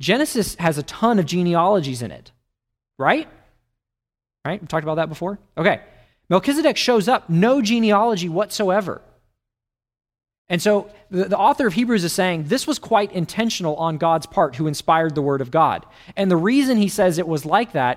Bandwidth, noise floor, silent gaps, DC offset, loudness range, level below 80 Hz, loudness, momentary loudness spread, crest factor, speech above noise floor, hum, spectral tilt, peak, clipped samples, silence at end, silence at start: 16 kHz; -88 dBFS; 10.38-10.45 s; under 0.1%; 6 LU; -54 dBFS; -20 LUFS; 9 LU; 18 dB; 69 dB; none; -5 dB/octave; -2 dBFS; under 0.1%; 0 s; 0 s